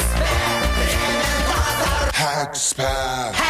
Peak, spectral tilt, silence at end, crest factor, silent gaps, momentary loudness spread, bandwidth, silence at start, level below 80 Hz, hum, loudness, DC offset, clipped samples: -8 dBFS; -3 dB/octave; 0 s; 12 dB; none; 2 LU; 15.5 kHz; 0 s; -26 dBFS; none; -20 LUFS; under 0.1%; under 0.1%